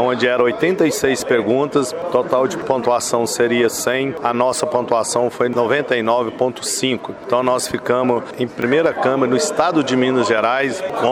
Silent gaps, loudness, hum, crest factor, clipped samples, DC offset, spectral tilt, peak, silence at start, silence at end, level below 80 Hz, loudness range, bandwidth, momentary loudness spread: none; -17 LUFS; none; 16 dB; under 0.1%; under 0.1%; -4 dB/octave; -2 dBFS; 0 s; 0 s; -56 dBFS; 1 LU; 16.5 kHz; 4 LU